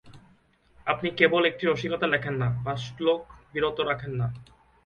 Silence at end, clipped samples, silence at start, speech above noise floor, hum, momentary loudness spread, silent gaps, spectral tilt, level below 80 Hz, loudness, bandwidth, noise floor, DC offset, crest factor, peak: 0.45 s; under 0.1%; 0.05 s; 35 dB; none; 11 LU; none; -6.5 dB/octave; -56 dBFS; -27 LUFS; 7.2 kHz; -61 dBFS; under 0.1%; 22 dB; -6 dBFS